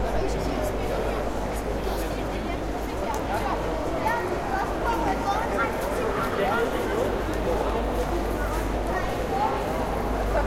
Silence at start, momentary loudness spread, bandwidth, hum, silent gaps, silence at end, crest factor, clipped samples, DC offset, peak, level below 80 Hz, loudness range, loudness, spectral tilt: 0 s; 4 LU; 16 kHz; none; none; 0 s; 14 dB; under 0.1%; under 0.1%; -12 dBFS; -32 dBFS; 3 LU; -27 LUFS; -5.5 dB/octave